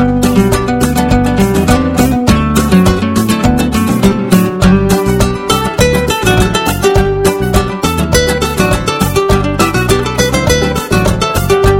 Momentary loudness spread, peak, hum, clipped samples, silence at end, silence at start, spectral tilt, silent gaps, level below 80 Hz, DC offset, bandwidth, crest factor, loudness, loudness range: 3 LU; 0 dBFS; none; 0.9%; 0 s; 0 s; -5.5 dB/octave; none; -20 dBFS; under 0.1%; 17 kHz; 10 dB; -11 LUFS; 1 LU